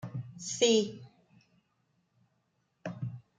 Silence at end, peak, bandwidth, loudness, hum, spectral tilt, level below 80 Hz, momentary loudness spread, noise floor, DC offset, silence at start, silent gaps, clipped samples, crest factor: 0.2 s; -12 dBFS; 9.6 kHz; -31 LUFS; none; -4 dB/octave; -74 dBFS; 19 LU; -77 dBFS; under 0.1%; 0.05 s; none; under 0.1%; 24 dB